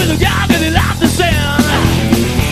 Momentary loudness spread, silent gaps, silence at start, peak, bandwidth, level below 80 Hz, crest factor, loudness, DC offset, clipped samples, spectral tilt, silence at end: 1 LU; none; 0 s; 0 dBFS; 14.5 kHz; -22 dBFS; 12 dB; -12 LUFS; under 0.1%; 0.2%; -5 dB/octave; 0 s